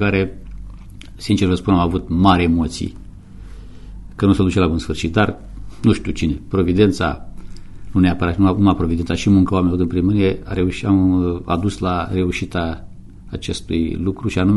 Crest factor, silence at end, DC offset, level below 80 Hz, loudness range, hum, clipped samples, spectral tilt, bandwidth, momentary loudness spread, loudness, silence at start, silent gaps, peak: 18 dB; 0 s; under 0.1%; -34 dBFS; 3 LU; none; under 0.1%; -7 dB/octave; 11.5 kHz; 14 LU; -18 LUFS; 0 s; none; 0 dBFS